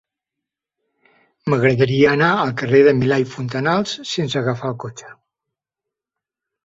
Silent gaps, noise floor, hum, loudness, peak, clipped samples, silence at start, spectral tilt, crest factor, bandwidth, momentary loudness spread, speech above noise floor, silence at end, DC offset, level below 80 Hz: none; -85 dBFS; none; -17 LUFS; -2 dBFS; under 0.1%; 1.45 s; -6 dB/octave; 18 dB; 7.8 kHz; 12 LU; 68 dB; 1.5 s; under 0.1%; -56 dBFS